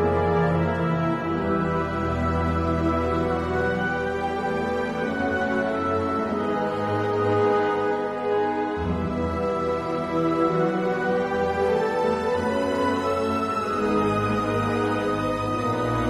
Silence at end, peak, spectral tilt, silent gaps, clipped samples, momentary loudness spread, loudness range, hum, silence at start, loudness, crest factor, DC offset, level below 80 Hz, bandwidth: 0 s; -10 dBFS; -7 dB/octave; none; under 0.1%; 4 LU; 1 LU; none; 0 s; -24 LUFS; 14 dB; under 0.1%; -42 dBFS; 13 kHz